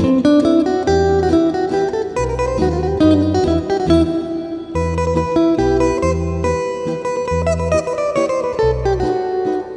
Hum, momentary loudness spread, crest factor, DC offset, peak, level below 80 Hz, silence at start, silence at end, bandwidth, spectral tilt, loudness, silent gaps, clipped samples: none; 7 LU; 14 dB; under 0.1%; -2 dBFS; -30 dBFS; 0 s; 0 s; 10 kHz; -7 dB/octave; -17 LUFS; none; under 0.1%